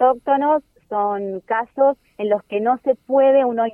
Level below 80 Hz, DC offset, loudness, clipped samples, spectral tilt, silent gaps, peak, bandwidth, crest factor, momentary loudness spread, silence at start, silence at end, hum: -64 dBFS; under 0.1%; -19 LUFS; under 0.1%; -8 dB/octave; none; -6 dBFS; 3.4 kHz; 14 dB; 8 LU; 0 s; 0 s; none